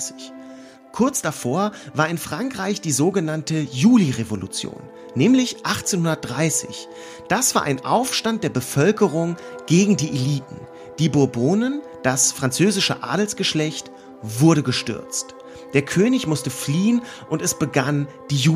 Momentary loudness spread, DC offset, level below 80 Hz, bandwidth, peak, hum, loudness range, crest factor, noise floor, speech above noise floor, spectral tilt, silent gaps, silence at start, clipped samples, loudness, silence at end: 15 LU; under 0.1%; -58 dBFS; 15.5 kHz; -4 dBFS; none; 2 LU; 18 dB; -41 dBFS; 21 dB; -4.5 dB/octave; none; 0 s; under 0.1%; -20 LUFS; 0 s